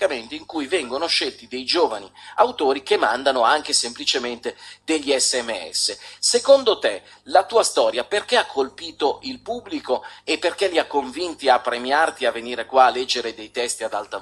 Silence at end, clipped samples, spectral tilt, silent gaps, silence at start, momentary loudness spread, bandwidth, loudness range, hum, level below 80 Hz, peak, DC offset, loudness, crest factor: 0 s; under 0.1%; -0.5 dB/octave; none; 0 s; 12 LU; 13 kHz; 4 LU; 50 Hz at -55 dBFS; -64 dBFS; 0 dBFS; under 0.1%; -21 LUFS; 20 dB